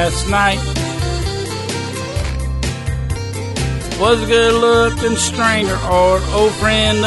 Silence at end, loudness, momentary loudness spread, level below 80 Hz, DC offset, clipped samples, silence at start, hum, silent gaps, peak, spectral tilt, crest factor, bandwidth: 0 s; -16 LUFS; 10 LU; -26 dBFS; under 0.1%; under 0.1%; 0 s; none; none; -2 dBFS; -4 dB/octave; 14 dB; 12 kHz